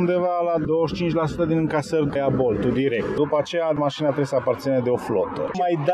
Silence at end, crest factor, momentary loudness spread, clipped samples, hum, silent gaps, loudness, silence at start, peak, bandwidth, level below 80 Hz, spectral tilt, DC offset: 0 s; 14 dB; 2 LU; under 0.1%; none; none; -22 LUFS; 0 s; -8 dBFS; 13 kHz; -48 dBFS; -7 dB/octave; under 0.1%